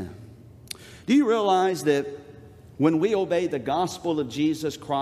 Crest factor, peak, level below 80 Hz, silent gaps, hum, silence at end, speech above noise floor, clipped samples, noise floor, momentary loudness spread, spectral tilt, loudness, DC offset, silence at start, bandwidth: 18 dB; -8 dBFS; -62 dBFS; none; none; 0 s; 23 dB; under 0.1%; -46 dBFS; 18 LU; -5.5 dB/octave; -24 LUFS; under 0.1%; 0 s; 15 kHz